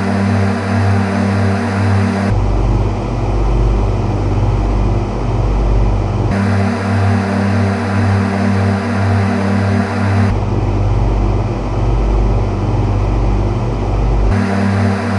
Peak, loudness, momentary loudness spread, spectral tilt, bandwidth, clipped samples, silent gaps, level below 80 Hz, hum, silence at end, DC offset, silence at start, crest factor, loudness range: -2 dBFS; -15 LUFS; 3 LU; -8 dB/octave; 11 kHz; under 0.1%; none; -20 dBFS; none; 0 s; under 0.1%; 0 s; 12 dB; 2 LU